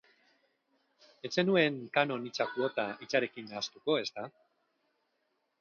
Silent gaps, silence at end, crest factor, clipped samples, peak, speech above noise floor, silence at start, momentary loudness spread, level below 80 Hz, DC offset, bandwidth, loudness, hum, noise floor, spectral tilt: none; 1.3 s; 22 dB; under 0.1%; -14 dBFS; 47 dB; 1.25 s; 11 LU; -82 dBFS; under 0.1%; 7.2 kHz; -32 LUFS; none; -79 dBFS; -5 dB/octave